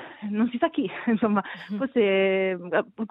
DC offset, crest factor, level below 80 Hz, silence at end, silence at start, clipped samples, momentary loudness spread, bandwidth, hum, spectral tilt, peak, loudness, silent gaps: under 0.1%; 16 dB; -68 dBFS; 0.05 s; 0 s; under 0.1%; 7 LU; 5.2 kHz; none; -9 dB/octave; -8 dBFS; -25 LUFS; none